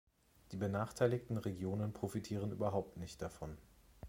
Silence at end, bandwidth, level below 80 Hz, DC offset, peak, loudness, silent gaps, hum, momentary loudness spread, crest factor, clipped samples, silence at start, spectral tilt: 0 s; 16.5 kHz; -62 dBFS; under 0.1%; -20 dBFS; -41 LUFS; none; none; 14 LU; 20 dB; under 0.1%; 0.5 s; -7 dB/octave